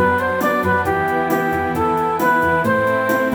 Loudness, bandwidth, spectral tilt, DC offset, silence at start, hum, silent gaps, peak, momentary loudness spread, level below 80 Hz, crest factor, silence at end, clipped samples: -17 LUFS; over 20 kHz; -6 dB/octave; under 0.1%; 0 s; none; none; -4 dBFS; 3 LU; -44 dBFS; 14 dB; 0 s; under 0.1%